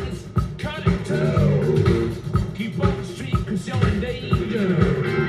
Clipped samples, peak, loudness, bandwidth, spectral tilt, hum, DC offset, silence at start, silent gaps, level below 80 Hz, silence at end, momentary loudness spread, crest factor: under 0.1%; -4 dBFS; -22 LUFS; 12.5 kHz; -7.5 dB/octave; none; under 0.1%; 0 s; none; -34 dBFS; 0 s; 7 LU; 18 dB